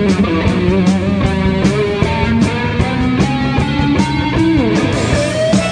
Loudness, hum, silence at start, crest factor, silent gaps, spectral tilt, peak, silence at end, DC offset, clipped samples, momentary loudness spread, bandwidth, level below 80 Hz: -14 LUFS; none; 0 s; 12 dB; none; -6.5 dB/octave; 0 dBFS; 0 s; under 0.1%; under 0.1%; 2 LU; 10 kHz; -26 dBFS